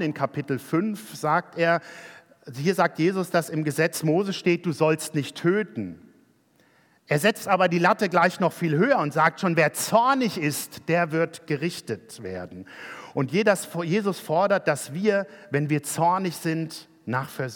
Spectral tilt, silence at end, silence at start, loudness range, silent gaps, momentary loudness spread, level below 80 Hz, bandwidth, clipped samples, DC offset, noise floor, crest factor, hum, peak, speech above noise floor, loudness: -5.5 dB/octave; 0 s; 0 s; 5 LU; none; 13 LU; -76 dBFS; 18 kHz; under 0.1%; under 0.1%; -62 dBFS; 20 dB; none; -6 dBFS; 37 dB; -24 LUFS